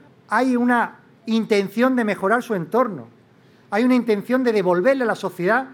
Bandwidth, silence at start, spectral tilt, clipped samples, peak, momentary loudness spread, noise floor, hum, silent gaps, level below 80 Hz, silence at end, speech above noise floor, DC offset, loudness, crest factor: 16.5 kHz; 0.3 s; -6 dB/octave; under 0.1%; -4 dBFS; 6 LU; -52 dBFS; none; none; -74 dBFS; 0 s; 33 dB; under 0.1%; -20 LUFS; 16 dB